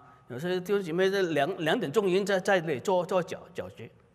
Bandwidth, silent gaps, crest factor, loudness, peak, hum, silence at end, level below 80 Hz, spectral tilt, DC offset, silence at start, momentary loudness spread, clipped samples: 15.5 kHz; none; 16 dB; -28 LUFS; -12 dBFS; none; 0.25 s; -72 dBFS; -5.5 dB/octave; under 0.1%; 0.3 s; 15 LU; under 0.1%